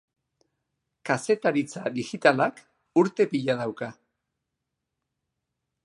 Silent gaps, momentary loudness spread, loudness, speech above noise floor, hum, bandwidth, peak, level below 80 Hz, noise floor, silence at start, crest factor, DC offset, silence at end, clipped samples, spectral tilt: none; 11 LU; -25 LUFS; 59 dB; none; 11.5 kHz; -4 dBFS; -76 dBFS; -83 dBFS; 1.05 s; 24 dB; under 0.1%; 1.9 s; under 0.1%; -5.5 dB/octave